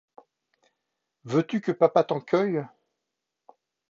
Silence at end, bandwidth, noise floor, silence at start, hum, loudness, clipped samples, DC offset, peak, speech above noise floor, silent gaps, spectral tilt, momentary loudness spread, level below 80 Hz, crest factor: 1.25 s; 7.4 kHz; -84 dBFS; 1.25 s; none; -25 LUFS; under 0.1%; under 0.1%; -6 dBFS; 60 dB; none; -7.5 dB/octave; 8 LU; -78 dBFS; 22 dB